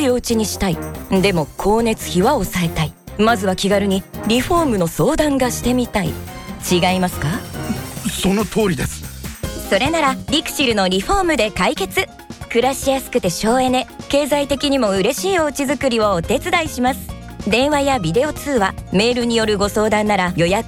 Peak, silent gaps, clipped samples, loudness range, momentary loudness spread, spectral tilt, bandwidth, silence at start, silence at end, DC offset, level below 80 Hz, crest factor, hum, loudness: -4 dBFS; none; under 0.1%; 2 LU; 8 LU; -4.5 dB/octave; 19.5 kHz; 0 s; 0 s; under 0.1%; -36 dBFS; 14 dB; none; -18 LUFS